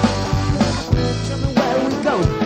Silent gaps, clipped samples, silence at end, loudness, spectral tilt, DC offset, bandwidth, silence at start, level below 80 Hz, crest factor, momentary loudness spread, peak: none; under 0.1%; 0 s; -19 LUFS; -6 dB/octave; under 0.1%; 15 kHz; 0 s; -30 dBFS; 16 dB; 2 LU; -2 dBFS